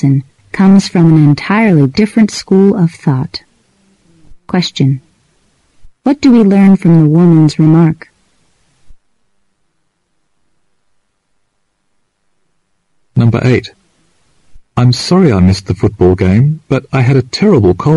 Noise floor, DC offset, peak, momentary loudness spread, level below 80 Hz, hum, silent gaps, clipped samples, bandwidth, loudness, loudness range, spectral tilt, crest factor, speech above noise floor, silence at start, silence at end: -65 dBFS; under 0.1%; 0 dBFS; 10 LU; -40 dBFS; none; none; under 0.1%; 11.5 kHz; -10 LUFS; 8 LU; -7.5 dB/octave; 10 dB; 56 dB; 0 s; 0 s